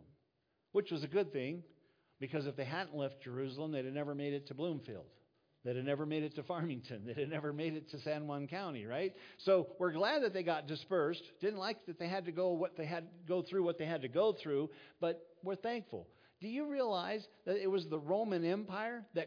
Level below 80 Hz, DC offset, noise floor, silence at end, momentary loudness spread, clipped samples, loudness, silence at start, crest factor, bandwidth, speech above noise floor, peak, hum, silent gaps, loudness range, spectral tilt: -88 dBFS; under 0.1%; -82 dBFS; 0 s; 9 LU; under 0.1%; -39 LUFS; 0 s; 20 dB; 5.2 kHz; 43 dB; -20 dBFS; none; none; 5 LU; -5 dB/octave